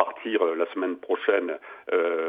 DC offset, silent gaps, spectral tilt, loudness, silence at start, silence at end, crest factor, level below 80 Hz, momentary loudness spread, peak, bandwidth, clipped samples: under 0.1%; none; -6 dB/octave; -26 LUFS; 0 s; 0 s; 22 dB; -82 dBFS; 7 LU; -4 dBFS; 3.8 kHz; under 0.1%